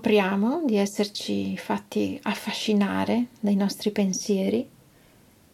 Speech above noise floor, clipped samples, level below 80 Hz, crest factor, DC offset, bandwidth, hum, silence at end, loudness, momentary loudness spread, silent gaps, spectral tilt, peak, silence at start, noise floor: 31 dB; under 0.1%; -70 dBFS; 16 dB; under 0.1%; 14.5 kHz; none; 0.85 s; -25 LUFS; 5 LU; none; -5 dB/octave; -10 dBFS; 0 s; -56 dBFS